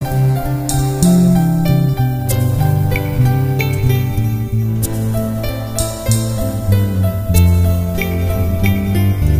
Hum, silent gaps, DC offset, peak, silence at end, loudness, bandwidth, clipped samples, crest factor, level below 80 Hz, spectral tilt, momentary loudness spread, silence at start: none; none; under 0.1%; 0 dBFS; 0 s; -15 LUFS; 16 kHz; under 0.1%; 14 dB; -26 dBFS; -6.5 dB/octave; 6 LU; 0 s